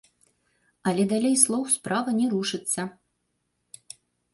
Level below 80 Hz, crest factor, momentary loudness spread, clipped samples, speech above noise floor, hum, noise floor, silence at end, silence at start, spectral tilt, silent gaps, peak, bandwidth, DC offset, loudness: -70 dBFS; 24 dB; 24 LU; under 0.1%; 52 dB; 60 Hz at -50 dBFS; -76 dBFS; 1.4 s; 0.85 s; -3.5 dB/octave; none; -4 dBFS; 12 kHz; under 0.1%; -24 LUFS